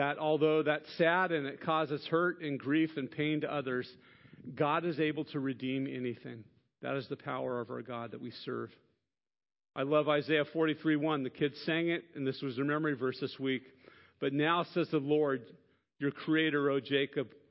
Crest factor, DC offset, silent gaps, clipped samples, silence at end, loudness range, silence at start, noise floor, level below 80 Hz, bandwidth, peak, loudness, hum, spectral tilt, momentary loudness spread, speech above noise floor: 18 dB; under 0.1%; none; under 0.1%; 0.25 s; 7 LU; 0 s; -84 dBFS; -80 dBFS; 5.6 kHz; -14 dBFS; -33 LUFS; none; -4 dB/octave; 11 LU; 51 dB